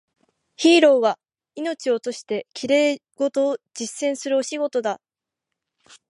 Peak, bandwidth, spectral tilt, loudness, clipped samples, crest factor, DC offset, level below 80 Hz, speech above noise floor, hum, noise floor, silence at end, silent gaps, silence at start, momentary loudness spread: -4 dBFS; 11.5 kHz; -2.5 dB/octave; -21 LUFS; under 0.1%; 18 dB; under 0.1%; -78 dBFS; 64 dB; none; -84 dBFS; 1.15 s; none; 0.6 s; 15 LU